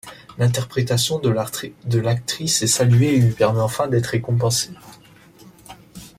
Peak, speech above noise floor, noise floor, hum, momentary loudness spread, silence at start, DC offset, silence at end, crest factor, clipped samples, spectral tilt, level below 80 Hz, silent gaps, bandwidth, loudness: -4 dBFS; 28 dB; -47 dBFS; none; 9 LU; 0.05 s; under 0.1%; 0.1 s; 16 dB; under 0.1%; -5 dB/octave; -52 dBFS; none; 16 kHz; -19 LUFS